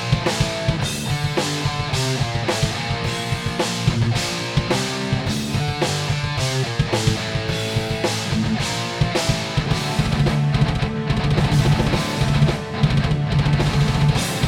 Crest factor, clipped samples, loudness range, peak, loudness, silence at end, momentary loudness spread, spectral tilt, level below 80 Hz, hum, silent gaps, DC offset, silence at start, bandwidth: 16 dB; under 0.1%; 3 LU; -4 dBFS; -21 LUFS; 0 s; 4 LU; -5 dB/octave; -34 dBFS; none; none; under 0.1%; 0 s; 16 kHz